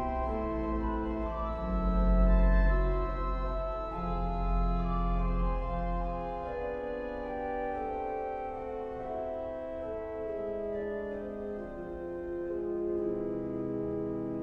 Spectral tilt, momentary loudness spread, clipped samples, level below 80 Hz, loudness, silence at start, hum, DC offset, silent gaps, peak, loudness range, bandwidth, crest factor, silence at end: -10 dB/octave; 9 LU; under 0.1%; -34 dBFS; -34 LUFS; 0 s; none; under 0.1%; none; -14 dBFS; 6 LU; 4.4 kHz; 16 dB; 0 s